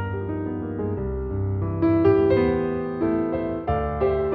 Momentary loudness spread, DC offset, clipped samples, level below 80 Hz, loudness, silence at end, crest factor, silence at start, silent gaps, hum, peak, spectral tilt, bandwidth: 10 LU; under 0.1%; under 0.1%; -38 dBFS; -23 LUFS; 0 s; 14 dB; 0 s; none; none; -8 dBFS; -11.5 dB/octave; 4.7 kHz